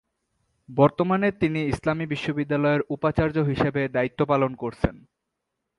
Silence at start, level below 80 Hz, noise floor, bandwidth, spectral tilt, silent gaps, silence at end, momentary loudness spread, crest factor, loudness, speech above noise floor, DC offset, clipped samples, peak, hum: 0.7 s; -46 dBFS; -81 dBFS; 11.5 kHz; -8 dB/octave; none; 0.85 s; 6 LU; 22 dB; -24 LUFS; 58 dB; under 0.1%; under 0.1%; -4 dBFS; none